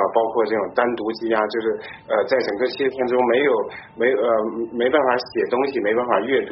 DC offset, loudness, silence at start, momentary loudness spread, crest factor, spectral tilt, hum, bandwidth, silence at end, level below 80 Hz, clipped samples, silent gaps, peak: under 0.1%; -21 LUFS; 0 s; 6 LU; 16 dB; -2.5 dB/octave; none; 6 kHz; 0 s; -62 dBFS; under 0.1%; none; -4 dBFS